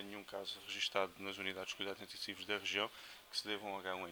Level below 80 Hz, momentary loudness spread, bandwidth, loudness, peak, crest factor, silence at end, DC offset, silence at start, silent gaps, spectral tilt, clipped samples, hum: -78 dBFS; 8 LU; over 20 kHz; -42 LUFS; -18 dBFS; 26 dB; 0 s; under 0.1%; 0 s; none; -2 dB/octave; under 0.1%; none